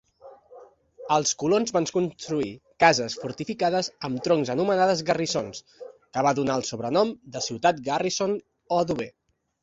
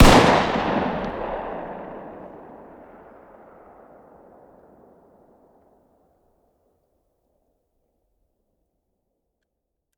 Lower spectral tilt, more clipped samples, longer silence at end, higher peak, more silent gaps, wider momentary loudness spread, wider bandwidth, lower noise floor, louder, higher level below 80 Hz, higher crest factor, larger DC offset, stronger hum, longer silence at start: about the same, -4 dB/octave vs -5 dB/octave; neither; second, 0.55 s vs 7.6 s; about the same, -2 dBFS vs 0 dBFS; neither; second, 11 LU vs 29 LU; second, 8 kHz vs 17.5 kHz; second, -50 dBFS vs -79 dBFS; second, -25 LUFS vs -21 LUFS; second, -62 dBFS vs -32 dBFS; about the same, 24 dB vs 24 dB; neither; neither; first, 0.25 s vs 0 s